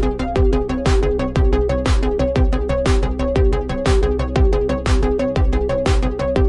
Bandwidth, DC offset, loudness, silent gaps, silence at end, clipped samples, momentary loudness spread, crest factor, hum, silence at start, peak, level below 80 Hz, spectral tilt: 11 kHz; under 0.1%; -18 LUFS; none; 0 s; under 0.1%; 2 LU; 12 dB; none; 0 s; -4 dBFS; -20 dBFS; -7 dB/octave